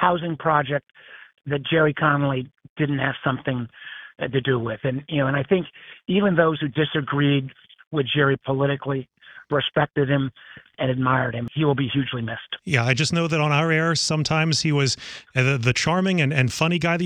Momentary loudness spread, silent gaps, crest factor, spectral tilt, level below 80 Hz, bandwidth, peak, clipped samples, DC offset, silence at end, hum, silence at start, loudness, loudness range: 10 LU; 2.69-2.76 s, 7.87-7.91 s; 18 dB; -5.5 dB/octave; -54 dBFS; 11 kHz; -4 dBFS; under 0.1%; under 0.1%; 0 s; none; 0 s; -22 LUFS; 4 LU